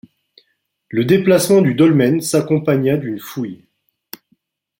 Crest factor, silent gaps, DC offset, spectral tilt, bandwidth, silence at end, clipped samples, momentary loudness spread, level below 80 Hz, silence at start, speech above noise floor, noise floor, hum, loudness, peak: 16 dB; none; under 0.1%; -6 dB/octave; 17 kHz; 1.25 s; under 0.1%; 23 LU; -58 dBFS; 0.9 s; 51 dB; -66 dBFS; none; -15 LUFS; -2 dBFS